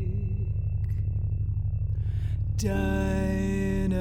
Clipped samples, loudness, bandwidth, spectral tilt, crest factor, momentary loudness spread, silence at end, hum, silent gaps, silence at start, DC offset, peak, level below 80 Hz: under 0.1%; -29 LUFS; 13 kHz; -7.5 dB/octave; 12 dB; 3 LU; 0 s; none; none; 0 s; under 0.1%; -14 dBFS; -32 dBFS